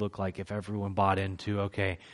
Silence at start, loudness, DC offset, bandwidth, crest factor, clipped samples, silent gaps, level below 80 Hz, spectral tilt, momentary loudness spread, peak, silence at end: 0 s; -32 LUFS; under 0.1%; 11.5 kHz; 18 dB; under 0.1%; none; -58 dBFS; -7 dB/octave; 8 LU; -12 dBFS; 0 s